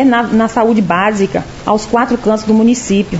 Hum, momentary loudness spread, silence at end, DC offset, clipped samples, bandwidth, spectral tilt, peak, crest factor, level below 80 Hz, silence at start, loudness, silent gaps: none; 5 LU; 0 s; under 0.1%; under 0.1%; 8 kHz; -5.5 dB/octave; 0 dBFS; 12 dB; -40 dBFS; 0 s; -12 LUFS; none